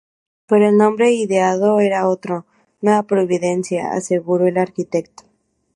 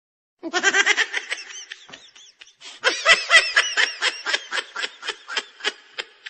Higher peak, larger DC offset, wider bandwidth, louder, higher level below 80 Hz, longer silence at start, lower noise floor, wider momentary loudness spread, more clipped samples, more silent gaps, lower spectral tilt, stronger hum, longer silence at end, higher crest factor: about the same, -2 dBFS vs -2 dBFS; neither; first, 11.5 kHz vs 8.8 kHz; first, -17 LUFS vs -20 LUFS; about the same, -64 dBFS vs -64 dBFS; about the same, 0.5 s vs 0.45 s; first, -63 dBFS vs -49 dBFS; second, 9 LU vs 21 LU; neither; neither; first, -6 dB/octave vs 2 dB/octave; neither; first, 0.7 s vs 0 s; second, 16 dB vs 22 dB